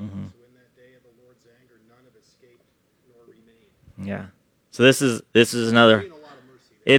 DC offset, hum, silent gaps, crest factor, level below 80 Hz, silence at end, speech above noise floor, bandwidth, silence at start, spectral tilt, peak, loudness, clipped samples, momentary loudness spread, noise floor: under 0.1%; none; none; 24 dB; -66 dBFS; 0 s; 47 dB; 18 kHz; 0 s; -4.5 dB/octave; 0 dBFS; -18 LUFS; under 0.1%; 23 LU; -65 dBFS